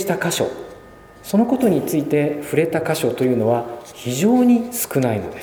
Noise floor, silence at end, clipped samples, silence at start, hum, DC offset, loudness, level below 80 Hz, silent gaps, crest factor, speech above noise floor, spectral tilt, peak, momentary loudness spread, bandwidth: -42 dBFS; 0 s; under 0.1%; 0 s; none; under 0.1%; -19 LUFS; -54 dBFS; none; 16 dB; 24 dB; -5.5 dB/octave; -4 dBFS; 11 LU; over 20 kHz